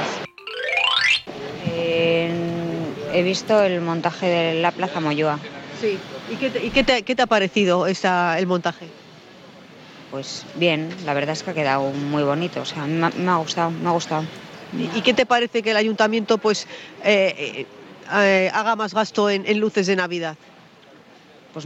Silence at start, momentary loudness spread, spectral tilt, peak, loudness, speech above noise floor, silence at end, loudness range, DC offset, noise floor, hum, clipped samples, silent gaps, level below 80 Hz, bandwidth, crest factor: 0 s; 13 LU; -4.5 dB/octave; -4 dBFS; -21 LUFS; 27 dB; 0 s; 4 LU; under 0.1%; -48 dBFS; none; under 0.1%; none; -54 dBFS; 10 kHz; 18 dB